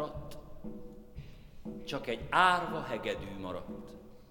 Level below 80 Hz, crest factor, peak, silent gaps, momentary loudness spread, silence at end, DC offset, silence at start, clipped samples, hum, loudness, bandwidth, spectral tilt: -52 dBFS; 26 dB; -10 dBFS; none; 24 LU; 0.05 s; under 0.1%; 0 s; under 0.1%; none; -33 LUFS; over 20 kHz; -4.5 dB/octave